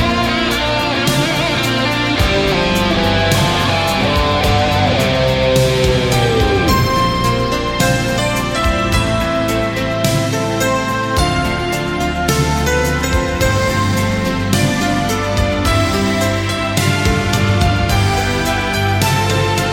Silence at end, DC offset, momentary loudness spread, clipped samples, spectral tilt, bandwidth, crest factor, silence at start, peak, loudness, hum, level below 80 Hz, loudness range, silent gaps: 0 s; under 0.1%; 3 LU; under 0.1%; -4.5 dB/octave; 16.5 kHz; 14 dB; 0 s; 0 dBFS; -15 LUFS; none; -26 dBFS; 2 LU; none